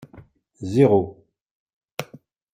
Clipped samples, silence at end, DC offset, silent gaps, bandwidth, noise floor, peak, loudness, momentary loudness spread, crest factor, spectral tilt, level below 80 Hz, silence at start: under 0.1%; 0.5 s; under 0.1%; 1.41-1.66 s, 1.73-1.81 s; 16 kHz; -49 dBFS; -4 dBFS; -19 LUFS; 19 LU; 22 dB; -8 dB/octave; -60 dBFS; 0.15 s